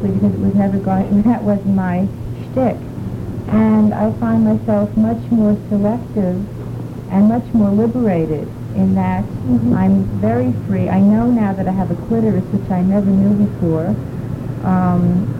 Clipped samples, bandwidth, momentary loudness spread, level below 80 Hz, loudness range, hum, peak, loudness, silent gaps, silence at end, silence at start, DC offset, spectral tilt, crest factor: under 0.1%; 5 kHz; 10 LU; -38 dBFS; 2 LU; none; -4 dBFS; -16 LUFS; none; 0 s; 0 s; under 0.1%; -10 dB/octave; 12 dB